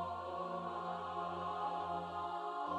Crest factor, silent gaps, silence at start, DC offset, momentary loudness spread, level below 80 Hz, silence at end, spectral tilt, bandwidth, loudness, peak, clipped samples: 12 dB; none; 0 s; under 0.1%; 2 LU; -72 dBFS; 0 s; -6 dB/octave; 11.5 kHz; -42 LUFS; -28 dBFS; under 0.1%